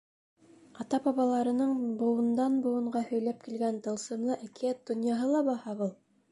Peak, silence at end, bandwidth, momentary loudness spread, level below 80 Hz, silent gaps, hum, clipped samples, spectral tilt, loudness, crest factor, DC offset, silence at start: -18 dBFS; 0.4 s; 11.5 kHz; 7 LU; -78 dBFS; none; none; under 0.1%; -6 dB/octave; -31 LUFS; 14 dB; under 0.1%; 0.75 s